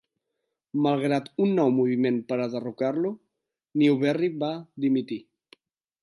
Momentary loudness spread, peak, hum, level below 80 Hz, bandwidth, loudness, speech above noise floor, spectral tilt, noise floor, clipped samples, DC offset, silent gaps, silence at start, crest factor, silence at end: 10 LU; -10 dBFS; none; -80 dBFS; 11 kHz; -26 LUFS; 57 dB; -8 dB/octave; -82 dBFS; under 0.1%; under 0.1%; none; 0.75 s; 16 dB; 0.8 s